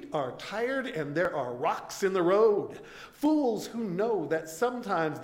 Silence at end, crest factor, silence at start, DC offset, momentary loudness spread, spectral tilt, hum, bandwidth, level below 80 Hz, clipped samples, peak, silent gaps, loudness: 0 s; 16 dB; 0 s; under 0.1%; 9 LU; -5.5 dB/octave; none; 16.5 kHz; -66 dBFS; under 0.1%; -12 dBFS; none; -29 LUFS